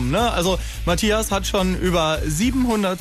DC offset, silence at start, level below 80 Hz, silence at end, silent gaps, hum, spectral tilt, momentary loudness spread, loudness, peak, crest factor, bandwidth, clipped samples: under 0.1%; 0 s; -30 dBFS; 0 s; none; none; -4.5 dB/octave; 3 LU; -20 LUFS; -8 dBFS; 12 dB; 14 kHz; under 0.1%